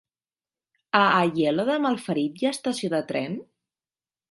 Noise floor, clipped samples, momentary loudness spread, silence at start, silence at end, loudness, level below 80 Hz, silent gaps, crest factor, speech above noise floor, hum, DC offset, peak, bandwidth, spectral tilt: under -90 dBFS; under 0.1%; 10 LU; 0.95 s; 0.9 s; -24 LUFS; -72 dBFS; none; 22 dB; over 66 dB; none; under 0.1%; -2 dBFS; 11.5 kHz; -5 dB/octave